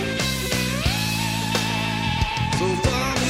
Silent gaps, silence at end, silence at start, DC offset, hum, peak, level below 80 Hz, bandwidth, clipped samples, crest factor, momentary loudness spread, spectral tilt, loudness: none; 0 s; 0 s; under 0.1%; none; -6 dBFS; -34 dBFS; 16 kHz; under 0.1%; 16 dB; 2 LU; -4 dB/octave; -22 LUFS